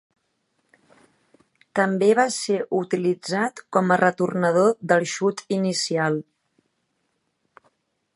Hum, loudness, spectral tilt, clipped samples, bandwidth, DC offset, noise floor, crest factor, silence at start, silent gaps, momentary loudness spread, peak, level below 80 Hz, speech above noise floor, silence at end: none; -22 LUFS; -5 dB/octave; under 0.1%; 11.5 kHz; under 0.1%; -73 dBFS; 22 dB; 1.75 s; none; 7 LU; -2 dBFS; -72 dBFS; 52 dB; 1.95 s